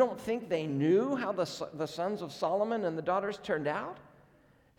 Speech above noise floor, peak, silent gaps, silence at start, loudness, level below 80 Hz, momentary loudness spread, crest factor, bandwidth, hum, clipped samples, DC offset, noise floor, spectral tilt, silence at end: 32 dB; -14 dBFS; none; 0 s; -32 LUFS; -70 dBFS; 10 LU; 18 dB; 17 kHz; none; under 0.1%; under 0.1%; -64 dBFS; -6 dB/octave; 0.7 s